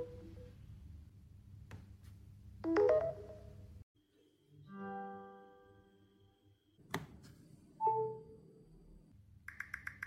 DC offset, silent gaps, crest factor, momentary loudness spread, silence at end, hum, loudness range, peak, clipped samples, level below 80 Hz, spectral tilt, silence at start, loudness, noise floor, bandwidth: under 0.1%; 3.83-3.95 s; 22 dB; 26 LU; 0 s; none; 14 LU; -20 dBFS; under 0.1%; -64 dBFS; -6.5 dB/octave; 0 s; -39 LUFS; -72 dBFS; 16 kHz